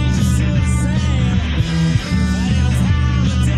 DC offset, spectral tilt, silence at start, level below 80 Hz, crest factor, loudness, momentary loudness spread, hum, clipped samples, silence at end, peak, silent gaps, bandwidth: under 0.1%; -6 dB/octave; 0 s; -20 dBFS; 12 dB; -17 LUFS; 2 LU; none; under 0.1%; 0 s; -4 dBFS; none; 12.5 kHz